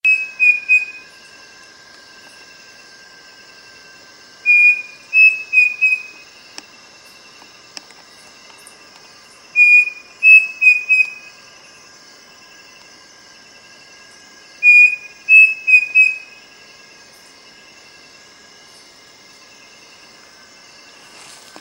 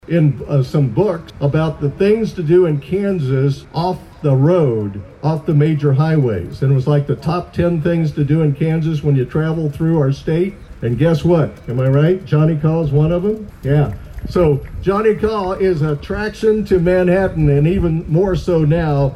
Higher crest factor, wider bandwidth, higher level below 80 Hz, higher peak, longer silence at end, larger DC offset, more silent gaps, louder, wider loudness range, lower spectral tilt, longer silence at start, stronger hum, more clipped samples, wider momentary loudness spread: first, 18 dB vs 12 dB; first, 16 kHz vs 8.2 kHz; second, -72 dBFS vs -34 dBFS; first, 0 dBFS vs -4 dBFS; first, 5.4 s vs 0 s; neither; neither; first, -10 LUFS vs -16 LUFS; first, 10 LU vs 1 LU; second, 1 dB/octave vs -9 dB/octave; about the same, 0.05 s vs 0.1 s; neither; neither; first, 13 LU vs 7 LU